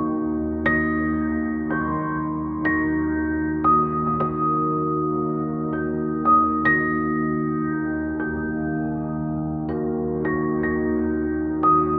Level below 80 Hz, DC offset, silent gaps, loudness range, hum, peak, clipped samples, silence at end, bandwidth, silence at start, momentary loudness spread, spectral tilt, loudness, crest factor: -42 dBFS; under 0.1%; none; 4 LU; none; -8 dBFS; under 0.1%; 0 s; 4.1 kHz; 0 s; 7 LU; -7.5 dB/octave; -23 LUFS; 16 dB